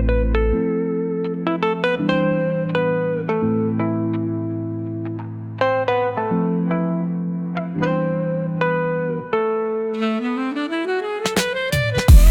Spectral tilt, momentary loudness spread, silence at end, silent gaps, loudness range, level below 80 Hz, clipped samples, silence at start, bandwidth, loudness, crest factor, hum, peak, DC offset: -6.5 dB/octave; 6 LU; 0 s; none; 2 LU; -24 dBFS; under 0.1%; 0 s; 17.5 kHz; -21 LUFS; 18 dB; none; -2 dBFS; under 0.1%